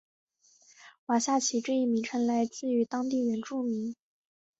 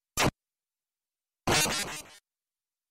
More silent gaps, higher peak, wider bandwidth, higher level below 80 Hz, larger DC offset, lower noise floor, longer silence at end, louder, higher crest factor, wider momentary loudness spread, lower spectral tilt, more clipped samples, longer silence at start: first, 0.98-1.07 s vs none; about the same, -14 dBFS vs -12 dBFS; second, 8.2 kHz vs 16 kHz; second, -76 dBFS vs -52 dBFS; neither; second, -62 dBFS vs under -90 dBFS; about the same, 0.65 s vs 0.75 s; about the same, -30 LUFS vs -28 LUFS; about the same, 16 dB vs 20 dB; second, 8 LU vs 12 LU; about the same, -3.5 dB/octave vs -2.5 dB/octave; neither; first, 0.8 s vs 0.15 s